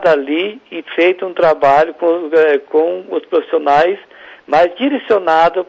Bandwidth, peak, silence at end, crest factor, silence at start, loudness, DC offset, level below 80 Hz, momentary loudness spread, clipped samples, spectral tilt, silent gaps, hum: 7.6 kHz; -4 dBFS; 0.05 s; 10 dB; 0 s; -14 LUFS; under 0.1%; -56 dBFS; 7 LU; under 0.1%; -6 dB/octave; none; none